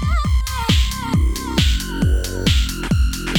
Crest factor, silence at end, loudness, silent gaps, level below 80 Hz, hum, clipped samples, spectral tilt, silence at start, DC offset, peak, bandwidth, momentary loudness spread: 16 dB; 0 s; -19 LUFS; none; -20 dBFS; none; under 0.1%; -4.5 dB/octave; 0 s; under 0.1%; -2 dBFS; 19 kHz; 2 LU